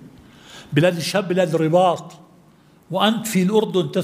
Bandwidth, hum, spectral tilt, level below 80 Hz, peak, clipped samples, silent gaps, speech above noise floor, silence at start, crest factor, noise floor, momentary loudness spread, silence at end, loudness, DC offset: 16 kHz; none; -5.5 dB/octave; -62 dBFS; -2 dBFS; under 0.1%; none; 33 dB; 0 s; 18 dB; -52 dBFS; 6 LU; 0 s; -19 LUFS; under 0.1%